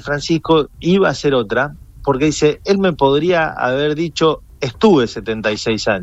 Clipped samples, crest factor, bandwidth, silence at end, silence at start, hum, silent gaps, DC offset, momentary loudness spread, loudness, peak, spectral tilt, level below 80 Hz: under 0.1%; 14 dB; 8.2 kHz; 0 s; 0.05 s; none; none; under 0.1%; 7 LU; -16 LUFS; -2 dBFS; -5.5 dB/octave; -40 dBFS